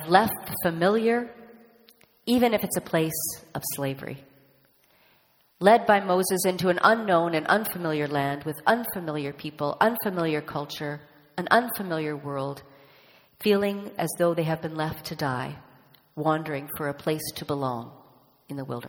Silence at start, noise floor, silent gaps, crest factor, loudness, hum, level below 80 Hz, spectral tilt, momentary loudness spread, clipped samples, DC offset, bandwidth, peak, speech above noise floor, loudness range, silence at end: 0 s; -63 dBFS; none; 24 dB; -26 LUFS; none; -64 dBFS; -5 dB/octave; 14 LU; under 0.1%; under 0.1%; over 20 kHz; -2 dBFS; 38 dB; 7 LU; 0 s